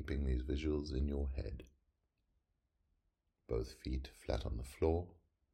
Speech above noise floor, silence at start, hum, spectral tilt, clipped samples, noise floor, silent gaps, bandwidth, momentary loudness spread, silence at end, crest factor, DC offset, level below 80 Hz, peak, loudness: 44 dB; 0 s; none; -7.5 dB/octave; under 0.1%; -83 dBFS; none; 13 kHz; 9 LU; 0.4 s; 20 dB; under 0.1%; -44 dBFS; -20 dBFS; -41 LUFS